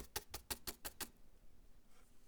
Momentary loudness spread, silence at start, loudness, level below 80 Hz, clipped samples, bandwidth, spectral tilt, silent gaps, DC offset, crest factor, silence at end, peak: 5 LU; 0 s; -48 LUFS; -62 dBFS; under 0.1%; over 20 kHz; -1.5 dB/octave; none; under 0.1%; 28 dB; 0 s; -24 dBFS